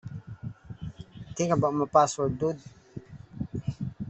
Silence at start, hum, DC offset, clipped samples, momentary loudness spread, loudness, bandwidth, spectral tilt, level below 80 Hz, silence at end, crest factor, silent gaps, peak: 0.05 s; none; under 0.1%; under 0.1%; 22 LU; -27 LUFS; 8.2 kHz; -6 dB/octave; -54 dBFS; 0 s; 22 dB; none; -8 dBFS